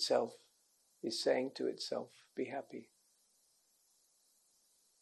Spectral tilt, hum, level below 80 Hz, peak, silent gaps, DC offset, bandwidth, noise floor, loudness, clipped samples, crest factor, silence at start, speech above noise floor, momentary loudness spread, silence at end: -3 dB/octave; none; under -90 dBFS; -20 dBFS; none; under 0.1%; 12 kHz; -75 dBFS; -39 LUFS; under 0.1%; 22 dB; 0 s; 36 dB; 13 LU; 2.2 s